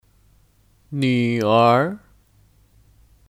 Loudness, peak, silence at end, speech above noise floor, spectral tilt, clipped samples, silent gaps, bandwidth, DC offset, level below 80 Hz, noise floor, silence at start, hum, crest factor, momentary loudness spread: -18 LUFS; -4 dBFS; 1.35 s; 40 dB; -7 dB/octave; under 0.1%; none; 15 kHz; under 0.1%; -58 dBFS; -57 dBFS; 0.9 s; none; 20 dB; 16 LU